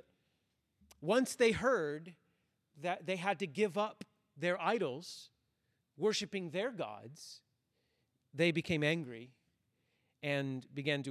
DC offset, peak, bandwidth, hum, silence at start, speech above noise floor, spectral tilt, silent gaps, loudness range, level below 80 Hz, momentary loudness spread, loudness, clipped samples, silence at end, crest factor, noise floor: under 0.1%; -18 dBFS; 14 kHz; none; 1 s; 46 dB; -5 dB/octave; none; 4 LU; -70 dBFS; 19 LU; -36 LUFS; under 0.1%; 0 s; 20 dB; -82 dBFS